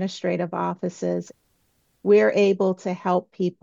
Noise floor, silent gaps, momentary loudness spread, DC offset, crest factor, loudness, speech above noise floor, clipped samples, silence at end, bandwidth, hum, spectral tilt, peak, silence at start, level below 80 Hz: -67 dBFS; none; 11 LU; under 0.1%; 16 dB; -23 LUFS; 45 dB; under 0.1%; 0.1 s; 7.6 kHz; none; -6.5 dB/octave; -8 dBFS; 0 s; -72 dBFS